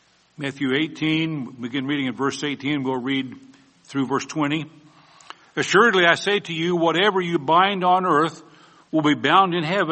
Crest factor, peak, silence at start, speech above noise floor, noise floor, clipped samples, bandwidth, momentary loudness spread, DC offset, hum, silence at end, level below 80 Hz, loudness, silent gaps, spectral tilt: 20 dB; -2 dBFS; 0.4 s; 25 dB; -46 dBFS; under 0.1%; 8.8 kHz; 11 LU; under 0.1%; none; 0 s; -66 dBFS; -21 LUFS; none; -5 dB/octave